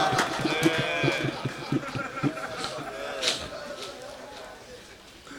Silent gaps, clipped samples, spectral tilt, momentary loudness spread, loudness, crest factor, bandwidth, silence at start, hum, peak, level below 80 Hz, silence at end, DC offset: none; under 0.1%; -4 dB/octave; 19 LU; -29 LUFS; 22 dB; 19 kHz; 0 s; none; -8 dBFS; -58 dBFS; 0 s; under 0.1%